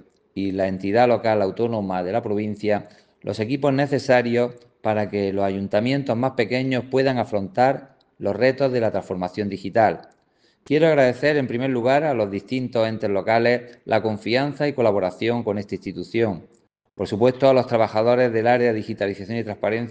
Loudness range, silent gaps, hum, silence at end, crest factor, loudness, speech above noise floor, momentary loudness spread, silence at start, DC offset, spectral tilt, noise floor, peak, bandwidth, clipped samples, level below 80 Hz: 2 LU; none; none; 0 s; 18 dB; -22 LUFS; 42 dB; 10 LU; 0.35 s; under 0.1%; -7 dB/octave; -62 dBFS; -4 dBFS; 9.2 kHz; under 0.1%; -62 dBFS